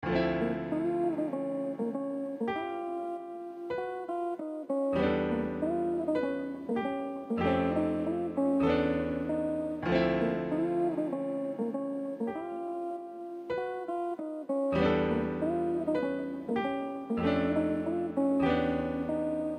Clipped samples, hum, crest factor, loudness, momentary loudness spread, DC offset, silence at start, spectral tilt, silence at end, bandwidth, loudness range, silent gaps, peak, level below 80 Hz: under 0.1%; none; 16 dB; -32 LUFS; 8 LU; under 0.1%; 0 s; -8 dB/octave; 0 s; 10 kHz; 5 LU; none; -14 dBFS; -56 dBFS